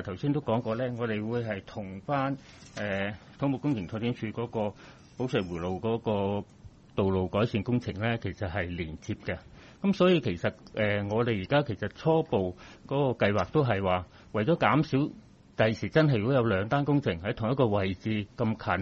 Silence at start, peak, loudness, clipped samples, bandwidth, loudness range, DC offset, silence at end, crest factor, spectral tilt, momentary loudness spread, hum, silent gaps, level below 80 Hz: 0 s; -8 dBFS; -29 LUFS; under 0.1%; 8 kHz; 5 LU; under 0.1%; 0 s; 20 dB; -7.5 dB/octave; 11 LU; none; none; -56 dBFS